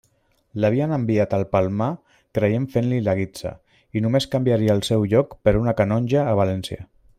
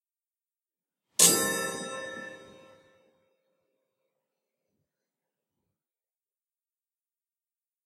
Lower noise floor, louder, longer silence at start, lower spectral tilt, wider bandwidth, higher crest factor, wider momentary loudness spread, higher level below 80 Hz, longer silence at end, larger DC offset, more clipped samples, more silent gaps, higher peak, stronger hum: second, -64 dBFS vs under -90 dBFS; first, -21 LUFS vs -24 LUFS; second, 0.55 s vs 1.2 s; first, -7.5 dB/octave vs -0.5 dB/octave; about the same, 15 kHz vs 16 kHz; second, 18 dB vs 30 dB; second, 11 LU vs 21 LU; first, -44 dBFS vs -80 dBFS; second, 0.35 s vs 5.4 s; neither; neither; neither; about the same, -4 dBFS vs -4 dBFS; neither